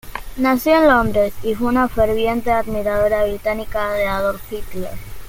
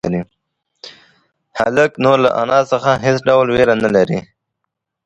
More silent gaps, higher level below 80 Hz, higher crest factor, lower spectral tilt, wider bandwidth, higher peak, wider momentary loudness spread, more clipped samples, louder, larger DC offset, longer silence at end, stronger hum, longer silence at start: neither; first, -34 dBFS vs -48 dBFS; about the same, 16 dB vs 16 dB; about the same, -6 dB/octave vs -6 dB/octave; first, 17 kHz vs 9.6 kHz; about the same, -2 dBFS vs 0 dBFS; first, 16 LU vs 11 LU; neither; second, -18 LUFS vs -14 LUFS; neither; second, 0 s vs 0.85 s; neither; about the same, 0.05 s vs 0.05 s